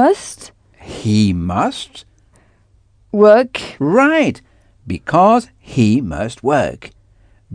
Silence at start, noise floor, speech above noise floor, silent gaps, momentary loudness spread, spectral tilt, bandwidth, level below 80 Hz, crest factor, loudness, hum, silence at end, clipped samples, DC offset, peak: 0 s; -53 dBFS; 39 dB; none; 19 LU; -6.5 dB/octave; 10 kHz; -44 dBFS; 16 dB; -15 LUFS; none; 0.65 s; under 0.1%; under 0.1%; 0 dBFS